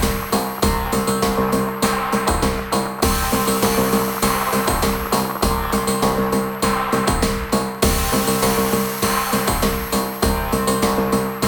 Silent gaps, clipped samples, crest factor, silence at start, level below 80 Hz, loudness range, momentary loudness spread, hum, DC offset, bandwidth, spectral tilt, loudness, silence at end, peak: none; under 0.1%; 16 dB; 0 s; -30 dBFS; 1 LU; 3 LU; none; under 0.1%; over 20 kHz; -4 dB/octave; -19 LUFS; 0 s; -2 dBFS